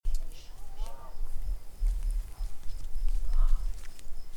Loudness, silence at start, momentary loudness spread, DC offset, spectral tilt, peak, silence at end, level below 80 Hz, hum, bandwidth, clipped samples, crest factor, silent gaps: -39 LUFS; 0.05 s; 14 LU; under 0.1%; -5 dB/octave; -12 dBFS; 0 s; -30 dBFS; none; 11 kHz; under 0.1%; 14 dB; none